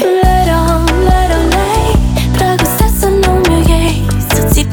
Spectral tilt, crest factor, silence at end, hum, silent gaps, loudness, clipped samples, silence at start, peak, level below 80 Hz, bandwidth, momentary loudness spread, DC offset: -5.5 dB/octave; 10 dB; 0 s; none; none; -11 LUFS; under 0.1%; 0 s; 0 dBFS; -14 dBFS; over 20 kHz; 3 LU; under 0.1%